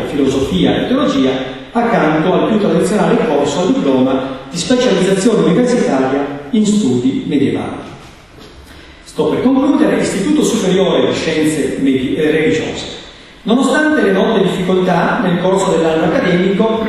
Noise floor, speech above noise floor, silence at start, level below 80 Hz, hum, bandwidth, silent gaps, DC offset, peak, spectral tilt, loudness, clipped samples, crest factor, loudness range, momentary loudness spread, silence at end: -37 dBFS; 24 dB; 0 s; -42 dBFS; none; 12.5 kHz; none; under 0.1%; 0 dBFS; -5.5 dB/octave; -13 LUFS; under 0.1%; 14 dB; 3 LU; 7 LU; 0 s